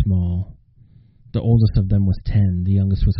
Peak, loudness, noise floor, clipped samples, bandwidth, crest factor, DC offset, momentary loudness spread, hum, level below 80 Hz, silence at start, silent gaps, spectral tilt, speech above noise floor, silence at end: -4 dBFS; -19 LUFS; -49 dBFS; under 0.1%; 5.4 kHz; 14 dB; under 0.1%; 10 LU; none; -28 dBFS; 0 s; none; -10.5 dB/octave; 33 dB; 0 s